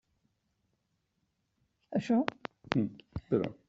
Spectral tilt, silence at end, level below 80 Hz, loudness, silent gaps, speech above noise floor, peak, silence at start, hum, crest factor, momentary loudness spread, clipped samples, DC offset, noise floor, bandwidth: -6 dB/octave; 0.15 s; -62 dBFS; -33 LUFS; none; 49 dB; -6 dBFS; 1.9 s; none; 30 dB; 11 LU; under 0.1%; under 0.1%; -80 dBFS; 7.6 kHz